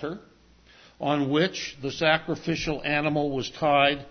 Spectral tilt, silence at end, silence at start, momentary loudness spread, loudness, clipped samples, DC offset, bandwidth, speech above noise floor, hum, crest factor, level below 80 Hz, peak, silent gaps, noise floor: -5 dB/octave; 0 s; 0 s; 11 LU; -25 LUFS; under 0.1%; under 0.1%; 6.6 kHz; 30 dB; none; 20 dB; -54 dBFS; -6 dBFS; none; -55 dBFS